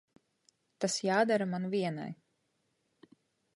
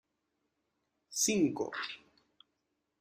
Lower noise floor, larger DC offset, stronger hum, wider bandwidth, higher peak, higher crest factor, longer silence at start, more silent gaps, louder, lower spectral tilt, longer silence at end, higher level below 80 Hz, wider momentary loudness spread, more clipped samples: second, -78 dBFS vs -83 dBFS; neither; neither; second, 11.5 kHz vs 15.5 kHz; first, -14 dBFS vs -18 dBFS; about the same, 20 dB vs 20 dB; second, 0.8 s vs 1.1 s; neither; about the same, -32 LUFS vs -33 LUFS; first, -4.5 dB/octave vs -3 dB/octave; first, 1.4 s vs 1.05 s; second, -82 dBFS vs -76 dBFS; about the same, 15 LU vs 13 LU; neither